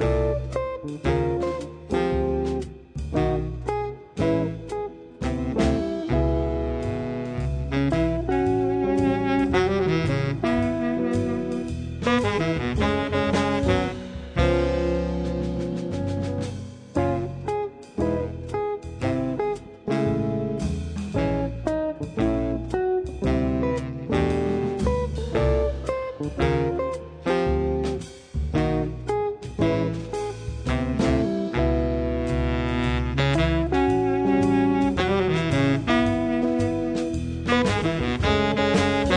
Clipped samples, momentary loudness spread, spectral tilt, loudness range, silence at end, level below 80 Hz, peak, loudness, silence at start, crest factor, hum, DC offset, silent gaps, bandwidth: under 0.1%; 8 LU; -7 dB/octave; 5 LU; 0 s; -34 dBFS; -6 dBFS; -25 LUFS; 0 s; 18 dB; none; under 0.1%; none; 10 kHz